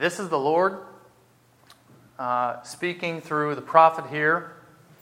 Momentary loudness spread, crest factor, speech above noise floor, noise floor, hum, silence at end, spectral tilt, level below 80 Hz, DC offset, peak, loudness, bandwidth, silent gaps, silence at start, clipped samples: 13 LU; 24 dB; 35 dB; -59 dBFS; none; 0.5 s; -5 dB/octave; -76 dBFS; under 0.1%; -2 dBFS; -24 LUFS; 16 kHz; none; 0 s; under 0.1%